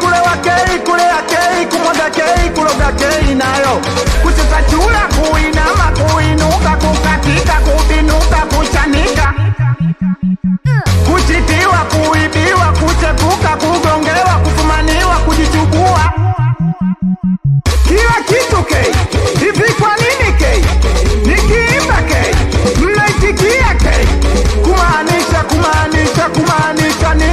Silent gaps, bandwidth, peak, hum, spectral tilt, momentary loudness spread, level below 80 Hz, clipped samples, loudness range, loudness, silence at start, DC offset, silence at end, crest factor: none; 14.5 kHz; -2 dBFS; none; -5 dB/octave; 3 LU; -16 dBFS; under 0.1%; 1 LU; -11 LUFS; 0 s; 0.2%; 0 s; 8 dB